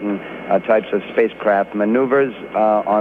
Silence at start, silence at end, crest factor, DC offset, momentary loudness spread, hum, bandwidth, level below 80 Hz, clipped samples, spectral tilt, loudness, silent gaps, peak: 0 s; 0 s; 14 dB; under 0.1%; 5 LU; none; 4.5 kHz; -58 dBFS; under 0.1%; -8.5 dB/octave; -18 LUFS; none; -4 dBFS